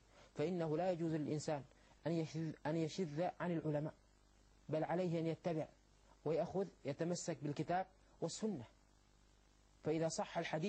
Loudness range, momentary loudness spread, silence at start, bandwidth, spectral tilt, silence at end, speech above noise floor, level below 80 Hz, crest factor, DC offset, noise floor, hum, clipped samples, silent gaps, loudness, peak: 3 LU; 9 LU; 0.15 s; 8.8 kHz; -6 dB/octave; 0 s; 29 dB; -72 dBFS; 16 dB; under 0.1%; -70 dBFS; 50 Hz at -65 dBFS; under 0.1%; none; -42 LUFS; -28 dBFS